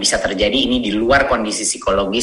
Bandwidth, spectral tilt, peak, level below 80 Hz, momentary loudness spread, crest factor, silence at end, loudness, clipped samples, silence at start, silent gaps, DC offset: 12.5 kHz; -2.5 dB/octave; 0 dBFS; -34 dBFS; 4 LU; 16 dB; 0 s; -16 LUFS; under 0.1%; 0 s; none; under 0.1%